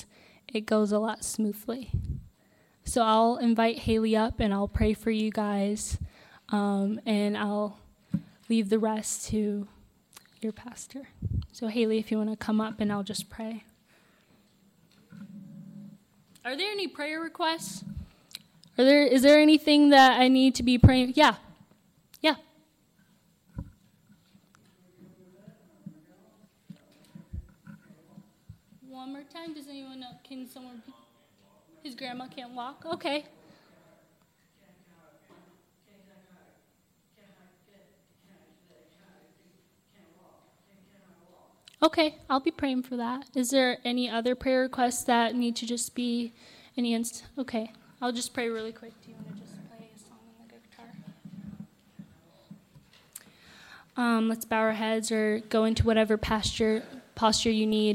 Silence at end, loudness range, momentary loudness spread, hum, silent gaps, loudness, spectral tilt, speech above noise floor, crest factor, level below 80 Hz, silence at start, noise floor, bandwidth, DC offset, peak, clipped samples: 0 s; 24 LU; 24 LU; none; none; -26 LUFS; -5 dB/octave; 42 dB; 20 dB; -50 dBFS; 0.55 s; -68 dBFS; 16 kHz; under 0.1%; -8 dBFS; under 0.1%